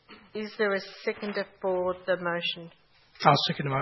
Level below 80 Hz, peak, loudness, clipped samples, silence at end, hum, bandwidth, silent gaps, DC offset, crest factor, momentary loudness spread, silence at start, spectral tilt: -68 dBFS; -4 dBFS; -28 LUFS; under 0.1%; 0 s; none; 6 kHz; none; under 0.1%; 26 dB; 14 LU; 0.1 s; -6 dB/octave